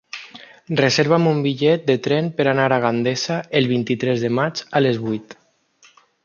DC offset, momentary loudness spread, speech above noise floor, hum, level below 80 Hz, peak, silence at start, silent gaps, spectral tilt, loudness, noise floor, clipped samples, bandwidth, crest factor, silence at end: under 0.1%; 8 LU; 36 dB; none; -62 dBFS; -2 dBFS; 0.15 s; none; -5.5 dB/octave; -19 LUFS; -55 dBFS; under 0.1%; 7.2 kHz; 18 dB; 0.9 s